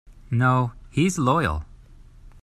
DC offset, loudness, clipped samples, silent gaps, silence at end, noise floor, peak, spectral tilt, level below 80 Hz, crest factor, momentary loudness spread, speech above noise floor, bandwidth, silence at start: under 0.1%; -23 LUFS; under 0.1%; none; 0.15 s; -47 dBFS; -8 dBFS; -6 dB/octave; -42 dBFS; 16 dB; 7 LU; 26 dB; 14 kHz; 0.1 s